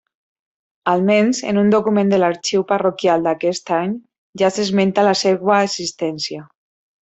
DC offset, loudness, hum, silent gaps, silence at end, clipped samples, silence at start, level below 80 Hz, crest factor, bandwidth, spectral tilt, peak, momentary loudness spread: under 0.1%; -17 LUFS; none; 4.18-4.33 s; 0.6 s; under 0.1%; 0.85 s; -62 dBFS; 14 dB; 8.2 kHz; -5 dB/octave; -2 dBFS; 9 LU